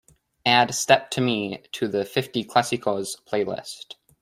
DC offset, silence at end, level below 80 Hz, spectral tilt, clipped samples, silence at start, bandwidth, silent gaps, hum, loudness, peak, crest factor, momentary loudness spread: under 0.1%; 0.3 s; -66 dBFS; -3.5 dB/octave; under 0.1%; 0.45 s; 16 kHz; none; none; -23 LUFS; -2 dBFS; 22 dB; 13 LU